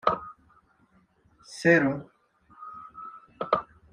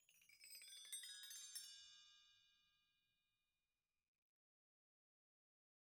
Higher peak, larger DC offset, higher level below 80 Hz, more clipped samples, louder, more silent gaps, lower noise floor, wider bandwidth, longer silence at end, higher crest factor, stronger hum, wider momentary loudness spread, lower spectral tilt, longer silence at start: first, -6 dBFS vs -40 dBFS; neither; first, -64 dBFS vs under -90 dBFS; neither; first, -26 LUFS vs -56 LUFS; neither; second, -64 dBFS vs under -90 dBFS; second, 11 kHz vs over 20 kHz; second, 0.3 s vs 3.1 s; about the same, 24 dB vs 24 dB; neither; first, 23 LU vs 13 LU; first, -6 dB/octave vs 4.5 dB/octave; about the same, 0.05 s vs 0 s